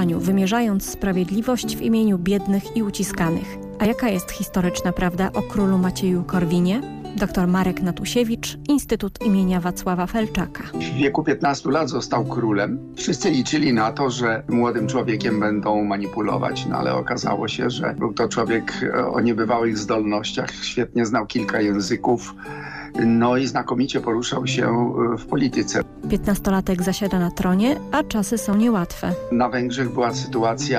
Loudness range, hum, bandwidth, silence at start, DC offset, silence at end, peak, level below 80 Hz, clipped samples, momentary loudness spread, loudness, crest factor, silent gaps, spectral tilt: 1 LU; none; 15.5 kHz; 0 s; under 0.1%; 0 s; -8 dBFS; -42 dBFS; under 0.1%; 5 LU; -21 LUFS; 12 dB; none; -5.5 dB/octave